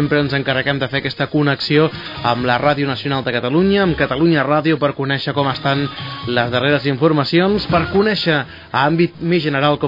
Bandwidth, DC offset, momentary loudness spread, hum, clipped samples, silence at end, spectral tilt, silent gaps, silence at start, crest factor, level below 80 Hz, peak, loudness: 5.4 kHz; under 0.1%; 5 LU; none; under 0.1%; 0 s; -8 dB/octave; none; 0 s; 14 dB; -44 dBFS; -2 dBFS; -17 LUFS